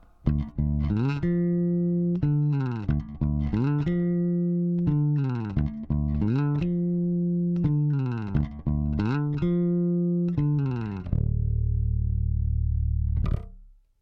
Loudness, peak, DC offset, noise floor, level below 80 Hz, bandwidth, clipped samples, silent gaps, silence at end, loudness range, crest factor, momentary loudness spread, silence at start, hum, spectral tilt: -26 LUFS; -10 dBFS; under 0.1%; -50 dBFS; -34 dBFS; 5.4 kHz; under 0.1%; none; 0.35 s; 1 LU; 14 dB; 4 LU; 0.25 s; none; -11 dB/octave